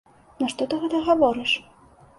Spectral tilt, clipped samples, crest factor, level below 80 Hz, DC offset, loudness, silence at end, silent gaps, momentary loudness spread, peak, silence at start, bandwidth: -4 dB/octave; under 0.1%; 18 dB; -58 dBFS; under 0.1%; -23 LUFS; 0.55 s; none; 8 LU; -6 dBFS; 0.4 s; 11.5 kHz